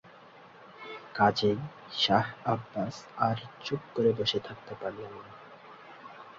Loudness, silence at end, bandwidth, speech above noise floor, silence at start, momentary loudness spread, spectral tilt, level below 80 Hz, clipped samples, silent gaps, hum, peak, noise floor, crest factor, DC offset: -30 LUFS; 0 s; 7.6 kHz; 23 dB; 0.05 s; 23 LU; -5.5 dB/octave; -64 dBFS; under 0.1%; none; none; -10 dBFS; -53 dBFS; 22 dB; under 0.1%